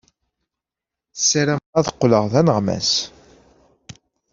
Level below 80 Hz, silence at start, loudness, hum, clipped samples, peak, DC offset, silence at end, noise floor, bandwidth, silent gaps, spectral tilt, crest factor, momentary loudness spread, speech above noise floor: -54 dBFS; 1.15 s; -18 LUFS; none; under 0.1%; -2 dBFS; under 0.1%; 0.4 s; -87 dBFS; 7.6 kHz; 1.66-1.73 s; -4 dB/octave; 20 dB; 5 LU; 69 dB